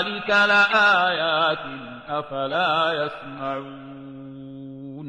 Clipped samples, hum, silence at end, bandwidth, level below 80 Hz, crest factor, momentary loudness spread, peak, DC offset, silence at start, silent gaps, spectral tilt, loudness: under 0.1%; none; 0 s; 9.8 kHz; -62 dBFS; 18 dB; 23 LU; -6 dBFS; under 0.1%; 0 s; none; -4 dB/octave; -20 LUFS